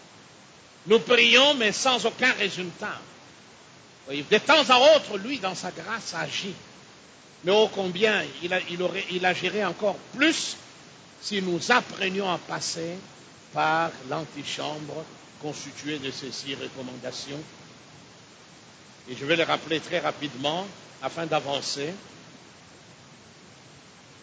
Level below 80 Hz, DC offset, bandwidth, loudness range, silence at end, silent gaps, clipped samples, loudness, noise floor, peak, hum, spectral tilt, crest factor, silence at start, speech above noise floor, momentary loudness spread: -70 dBFS; under 0.1%; 8 kHz; 12 LU; 0.45 s; none; under 0.1%; -24 LUFS; -51 dBFS; -4 dBFS; none; -3 dB/octave; 22 dB; 0.15 s; 25 dB; 18 LU